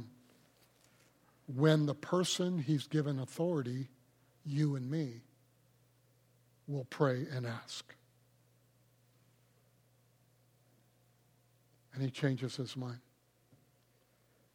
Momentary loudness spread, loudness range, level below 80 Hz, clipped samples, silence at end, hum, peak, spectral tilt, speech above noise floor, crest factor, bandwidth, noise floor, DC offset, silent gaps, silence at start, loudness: 17 LU; 9 LU; -82 dBFS; under 0.1%; 1.55 s; none; -16 dBFS; -6 dB/octave; 37 dB; 24 dB; 15.5 kHz; -71 dBFS; under 0.1%; none; 0 s; -36 LUFS